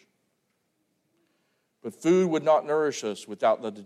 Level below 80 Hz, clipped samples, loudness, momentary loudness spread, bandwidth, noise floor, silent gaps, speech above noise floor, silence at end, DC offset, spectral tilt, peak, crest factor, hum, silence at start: -82 dBFS; under 0.1%; -25 LUFS; 13 LU; 13 kHz; -75 dBFS; none; 50 dB; 0 s; under 0.1%; -5.5 dB/octave; -10 dBFS; 18 dB; none; 1.85 s